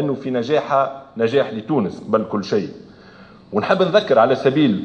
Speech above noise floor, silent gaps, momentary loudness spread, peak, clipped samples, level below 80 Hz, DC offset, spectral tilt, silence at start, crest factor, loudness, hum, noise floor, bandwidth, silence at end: 26 dB; none; 8 LU; -2 dBFS; under 0.1%; -62 dBFS; under 0.1%; -7 dB/octave; 0 s; 18 dB; -19 LUFS; none; -44 dBFS; 8.4 kHz; 0 s